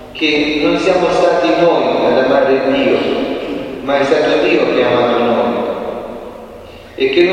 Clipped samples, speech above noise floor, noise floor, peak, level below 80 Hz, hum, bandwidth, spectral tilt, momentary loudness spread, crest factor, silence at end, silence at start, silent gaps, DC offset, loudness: under 0.1%; 21 dB; -33 dBFS; 0 dBFS; -44 dBFS; none; 9.8 kHz; -5.5 dB/octave; 14 LU; 14 dB; 0 s; 0 s; none; under 0.1%; -13 LUFS